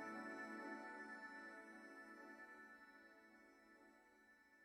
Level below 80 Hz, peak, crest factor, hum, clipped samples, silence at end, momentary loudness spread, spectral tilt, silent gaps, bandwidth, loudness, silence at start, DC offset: under -90 dBFS; -40 dBFS; 18 dB; none; under 0.1%; 0 s; 16 LU; -4 dB/octave; none; 12 kHz; -56 LUFS; 0 s; under 0.1%